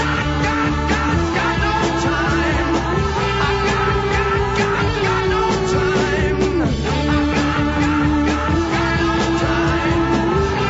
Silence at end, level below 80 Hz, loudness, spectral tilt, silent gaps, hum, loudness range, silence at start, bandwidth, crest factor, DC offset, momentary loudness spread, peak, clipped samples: 0 s; -28 dBFS; -18 LUFS; -6 dB/octave; none; none; 0 LU; 0 s; 8 kHz; 12 dB; under 0.1%; 1 LU; -4 dBFS; under 0.1%